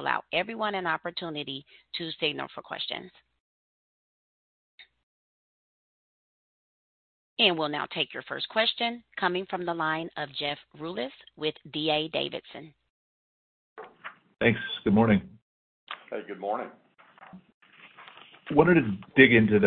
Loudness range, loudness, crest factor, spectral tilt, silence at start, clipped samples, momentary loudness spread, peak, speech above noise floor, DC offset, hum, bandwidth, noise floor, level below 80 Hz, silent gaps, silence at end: 8 LU; -27 LUFS; 26 dB; -9.5 dB/octave; 0 s; under 0.1%; 21 LU; -4 dBFS; 27 dB; under 0.1%; none; 4.6 kHz; -55 dBFS; -62 dBFS; 3.40-4.78 s, 5.03-7.37 s, 12.90-13.76 s, 15.42-15.87 s, 17.54-17.61 s; 0 s